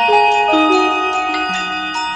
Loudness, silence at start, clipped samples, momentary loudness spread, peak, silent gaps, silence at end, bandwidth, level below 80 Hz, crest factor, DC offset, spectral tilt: -14 LUFS; 0 s; under 0.1%; 7 LU; -2 dBFS; none; 0 s; 11 kHz; -50 dBFS; 14 dB; under 0.1%; -3 dB/octave